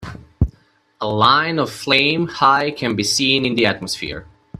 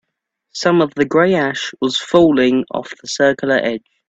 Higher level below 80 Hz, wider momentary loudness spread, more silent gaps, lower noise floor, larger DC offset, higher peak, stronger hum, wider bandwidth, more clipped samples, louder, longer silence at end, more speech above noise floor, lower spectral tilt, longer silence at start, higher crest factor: first, -38 dBFS vs -54 dBFS; about the same, 12 LU vs 12 LU; neither; second, -56 dBFS vs -75 dBFS; neither; about the same, 0 dBFS vs 0 dBFS; neither; first, 15.5 kHz vs 8.2 kHz; neither; about the same, -17 LUFS vs -16 LUFS; about the same, 0.35 s vs 0.3 s; second, 38 dB vs 60 dB; about the same, -4 dB/octave vs -5 dB/octave; second, 0 s vs 0.55 s; about the same, 18 dB vs 16 dB